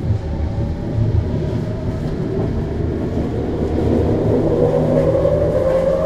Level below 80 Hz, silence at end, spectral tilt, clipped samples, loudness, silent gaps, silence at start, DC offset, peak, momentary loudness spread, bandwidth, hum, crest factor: -28 dBFS; 0 s; -9.5 dB/octave; under 0.1%; -18 LUFS; none; 0 s; under 0.1%; -2 dBFS; 7 LU; 9.2 kHz; none; 16 dB